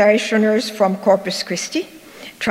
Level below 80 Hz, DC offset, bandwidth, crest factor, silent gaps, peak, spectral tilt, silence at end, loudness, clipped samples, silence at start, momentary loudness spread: -66 dBFS; under 0.1%; 16 kHz; 16 dB; none; -2 dBFS; -4 dB/octave; 0 s; -18 LUFS; under 0.1%; 0 s; 18 LU